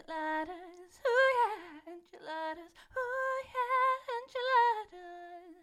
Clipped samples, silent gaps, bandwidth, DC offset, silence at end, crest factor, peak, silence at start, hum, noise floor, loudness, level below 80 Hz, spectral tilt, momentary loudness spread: under 0.1%; none; 14 kHz; under 0.1%; 0.1 s; 18 dB; -16 dBFS; 0.1 s; none; -52 dBFS; -32 LUFS; -72 dBFS; -2.5 dB/octave; 21 LU